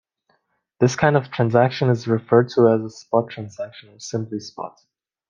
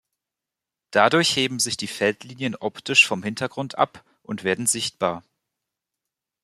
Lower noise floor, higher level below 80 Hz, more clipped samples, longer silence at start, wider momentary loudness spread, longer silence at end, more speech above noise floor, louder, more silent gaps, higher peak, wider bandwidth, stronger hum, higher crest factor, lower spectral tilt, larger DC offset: second, -68 dBFS vs -87 dBFS; first, -60 dBFS vs -66 dBFS; neither; about the same, 0.8 s vs 0.9 s; first, 17 LU vs 12 LU; second, 0.6 s vs 1.25 s; second, 48 dB vs 64 dB; about the same, -20 LUFS vs -22 LUFS; neither; about the same, -2 dBFS vs 0 dBFS; second, 7.4 kHz vs 14 kHz; neither; about the same, 20 dB vs 24 dB; first, -6.5 dB/octave vs -2.5 dB/octave; neither